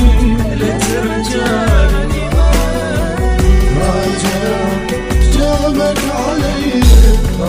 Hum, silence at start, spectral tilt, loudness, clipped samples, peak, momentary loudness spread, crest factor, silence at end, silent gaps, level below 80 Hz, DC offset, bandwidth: none; 0 s; -5.5 dB/octave; -13 LUFS; 0.3%; 0 dBFS; 6 LU; 10 dB; 0 s; none; -14 dBFS; under 0.1%; 16 kHz